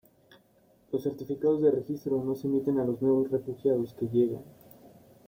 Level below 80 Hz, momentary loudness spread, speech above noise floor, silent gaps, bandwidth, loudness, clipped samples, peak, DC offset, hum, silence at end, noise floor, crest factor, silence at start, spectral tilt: -68 dBFS; 7 LU; 36 dB; none; 16.5 kHz; -29 LUFS; under 0.1%; -14 dBFS; under 0.1%; none; 0.4 s; -64 dBFS; 16 dB; 0.9 s; -9.5 dB/octave